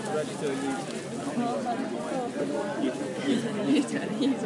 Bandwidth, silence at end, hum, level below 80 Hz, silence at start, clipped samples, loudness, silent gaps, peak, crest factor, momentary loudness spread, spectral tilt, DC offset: 11.5 kHz; 0 s; none; -76 dBFS; 0 s; under 0.1%; -30 LUFS; none; -14 dBFS; 14 dB; 6 LU; -5 dB/octave; under 0.1%